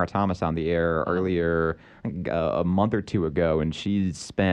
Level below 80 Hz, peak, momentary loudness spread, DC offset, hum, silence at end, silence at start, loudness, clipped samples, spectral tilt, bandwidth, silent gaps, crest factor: -44 dBFS; -8 dBFS; 5 LU; under 0.1%; none; 0 s; 0 s; -25 LUFS; under 0.1%; -7 dB/octave; 10 kHz; none; 16 dB